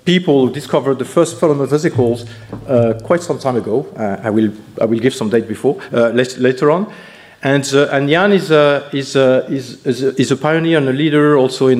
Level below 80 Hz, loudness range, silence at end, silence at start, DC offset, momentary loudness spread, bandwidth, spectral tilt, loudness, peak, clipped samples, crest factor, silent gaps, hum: -54 dBFS; 3 LU; 0 s; 0.05 s; under 0.1%; 8 LU; 14.5 kHz; -6 dB/octave; -15 LUFS; 0 dBFS; under 0.1%; 14 dB; none; none